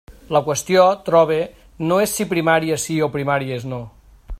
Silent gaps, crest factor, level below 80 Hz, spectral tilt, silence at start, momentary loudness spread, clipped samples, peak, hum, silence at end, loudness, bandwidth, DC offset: none; 18 dB; -44 dBFS; -4.5 dB/octave; 0.1 s; 12 LU; under 0.1%; -2 dBFS; none; 0 s; -18 LUFS; 16 kHz; under 0.1%